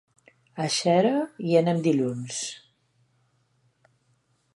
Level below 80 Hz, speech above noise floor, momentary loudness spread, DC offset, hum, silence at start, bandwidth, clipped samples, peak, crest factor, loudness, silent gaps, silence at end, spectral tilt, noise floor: -74 dBFS; 45 dB; 13 LU; under 0.1%; none; 0.55 s; 11.5 kHz; under 0.1%; -8 dBFS; 20 dB; -25 LUFS; none; 2 s; -5 dB/octave; -69 dBFS